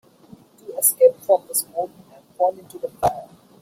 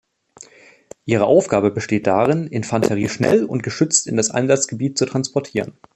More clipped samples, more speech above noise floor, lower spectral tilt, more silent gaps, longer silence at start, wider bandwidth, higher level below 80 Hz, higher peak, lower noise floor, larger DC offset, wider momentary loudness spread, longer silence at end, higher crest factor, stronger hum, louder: neither; about the same, 28 dB vs 29 dB; second, -3 dB/octave vs -4.5 dB/octave; neither; second, 0.7 s vs 1.05 s; first, 16.5 kHz vs 13 kHz; about the same, -58 dBFS vs -56 dBFS; about the same, -2 dBFS vs -2 dBFS; about the same, -49 dBFS vs -47 dBFS; neither; first, 19 LU vs 8 LU; about the same, 0.35 s vs 0.25 s; about the same, 20 dB vs 18 dB; neither; about the same, -20 LUFS vs -18 LUFS